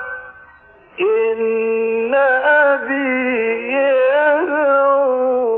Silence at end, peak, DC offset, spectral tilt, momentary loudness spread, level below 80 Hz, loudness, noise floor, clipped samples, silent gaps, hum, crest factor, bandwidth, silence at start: 0 s; -4 dBFS; under 0.1%; -8.5 dB/octave; 5 LU; -60 dBFS; -15 LUFS; -46 dBFS; under 0.1%; none; none; 12 dB; 4 kHz; 0 s